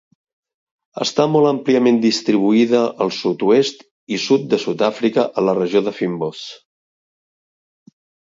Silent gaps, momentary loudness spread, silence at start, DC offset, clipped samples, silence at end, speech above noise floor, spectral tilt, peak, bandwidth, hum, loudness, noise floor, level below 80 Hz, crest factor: 3.91-4.07 s; 9 LU; 0.95 s; under 0.1%; under 0.1%; 1.7 s; over 73 dB; -5.5 dB/octave; -2 dBFS; 7.8 kHz; none; -17 LUFS; under -90 dBFS; -66 dBFS; 16 dB